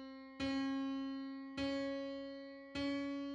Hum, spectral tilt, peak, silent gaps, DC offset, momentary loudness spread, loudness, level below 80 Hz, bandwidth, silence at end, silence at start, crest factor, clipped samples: none; -5 dB/octave; -28 dBFS; none; under 0.1%; 9 LU; -42 LUFS; -66 dBFS; 8.4 kHz; 0 s; 0 s; 14 dB; under 0.1%